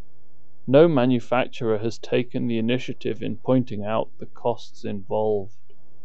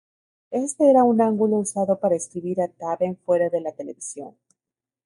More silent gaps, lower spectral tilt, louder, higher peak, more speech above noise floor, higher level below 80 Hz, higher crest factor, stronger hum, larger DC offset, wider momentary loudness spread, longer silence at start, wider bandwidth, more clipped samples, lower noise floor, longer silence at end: neither; about the same, -7.5 dB/octave vs -6.5 dB/octave; about the same, -24 LUFS vs -22 LUFS; about the same, -4 dBFS vs -6 dBFS; second, 39 dB vs 68 dB; about the same, -68 dBFS vs -72 dBFS; about the same, 20 dB vs 18 dB; neither; first, 4% vs under 0.1%; about the same, 15 LU vs 17 LU; first, 0.65 s vs 0.5 s; second, 8 kHz vs 11.5 kHz; neither; second, -62 dBFS vs -89 dBFS; second, 0.55 s vs 0.75 s